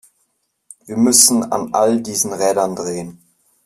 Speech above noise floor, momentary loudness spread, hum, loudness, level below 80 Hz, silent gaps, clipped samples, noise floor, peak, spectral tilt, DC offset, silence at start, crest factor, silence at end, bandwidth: 51 dB; 17 LU; none; -15 LUFS; -60 dBFS; none; under 0.1%; -67 dBFS; 0 dBFS; -3 dB/octave; under 0.1%; 0.85 s; 18 dB; 0.5 s; 16 kHz